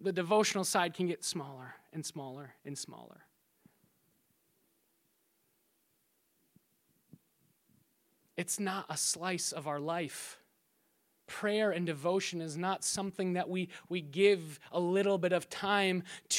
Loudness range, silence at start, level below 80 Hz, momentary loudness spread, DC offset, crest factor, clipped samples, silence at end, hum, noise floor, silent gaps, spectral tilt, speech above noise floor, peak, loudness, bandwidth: 15 LU; 0 s; -80 dBFS; 16 LU; under 0.1%; 22 dB; under 0.1%; 0 s; none; -76 dBFS; none; -3.5 dB/octave; 42 dB; -14 dBFS; -34 LUFS; 16.5 kHz